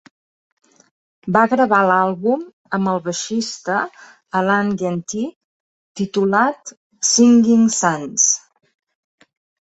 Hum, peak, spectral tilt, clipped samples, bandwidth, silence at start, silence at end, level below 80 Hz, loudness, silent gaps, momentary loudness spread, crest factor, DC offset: none; -2 dBFS; -3.5 dB/octave; under 0.1%; 8.2 kHz; 1.25 s; 1.35 s; -62 dBFS; -17 LUFS; 2.53-2.65 s, 5.36-5.95 s, 6.77-6.90 s; 13 LU; 18 dB; under 0.1%